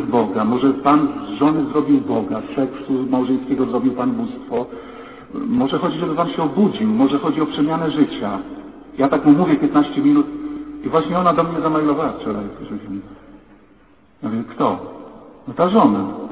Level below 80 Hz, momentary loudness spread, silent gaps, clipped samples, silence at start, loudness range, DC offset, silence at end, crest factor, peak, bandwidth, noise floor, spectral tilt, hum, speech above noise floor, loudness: -52 dBFS; 16 LU; none; under 0.1%; 0 s; 6 LU; 0.1%; 0 s; 16 dB; -2 dBFS; 4 kHz; -51 dBFS; -11.5 dB/octave; none; 34 dB; -18 LUFS